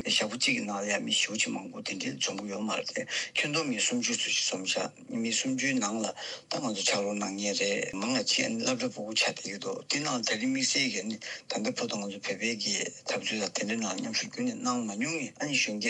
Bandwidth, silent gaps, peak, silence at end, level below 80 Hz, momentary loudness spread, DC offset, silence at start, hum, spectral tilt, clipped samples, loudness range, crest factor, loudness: 11.5 kHz; none; -12 dBFS; 0 s; -80 dBFS; 8 LU; under 0.1%; 0 s; none; -2 dB/octave; under 0.1%; 2 LU; 18 dB; -30 LUFS